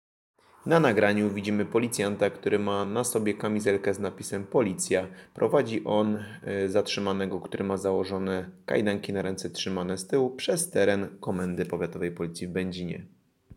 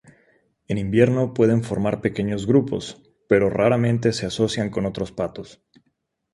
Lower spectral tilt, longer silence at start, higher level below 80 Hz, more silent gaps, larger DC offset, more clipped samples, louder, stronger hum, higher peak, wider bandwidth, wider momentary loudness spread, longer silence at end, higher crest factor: second, -5 dB/octave vs -6.5 dB/octave; about the same, 0.65 s vs 0.7 s; second, -66 dBFS vs -50 dBFS; neither; neither; neither; second, -28 LUFS vs -21 LUFS; neither; second, -8 dBFS vs -2 dBFS; first, 16.5 kHz vs 11.5 kHz; second, 8 LU vs 11 LU; second, 0 s vs 0.8 s; about the same, 20 dB vs 20 dB